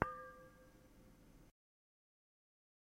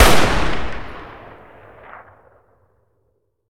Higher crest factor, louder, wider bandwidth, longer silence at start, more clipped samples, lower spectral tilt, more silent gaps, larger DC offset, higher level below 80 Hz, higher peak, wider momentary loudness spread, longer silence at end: first, 38 dB vs 18 dB; second, -50 LUFS vs -19 LUFS; about the same, 16 kHz vs 17 kHz; about the same, 0 s vs 0 s; neither; first, -7 dB/octave vs -3.5 dB/octave; neither; neither; second, -68 dBFS vs -28 dBFS; second, -14 dBFS vs 0 dBFS; second, 17 LU vs 26 LU; second, 1.5 s vs 2.4 s